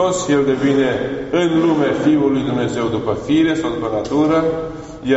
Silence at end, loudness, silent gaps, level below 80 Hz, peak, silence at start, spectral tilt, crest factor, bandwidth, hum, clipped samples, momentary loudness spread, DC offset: 0 s; -17 LUFS; none; -44 dBFS; -4 dBFS; 0 s; -5.5 dB/octave; 12 dB; 8 kHz; none; under 0.1%; 6 LU; under 0.1%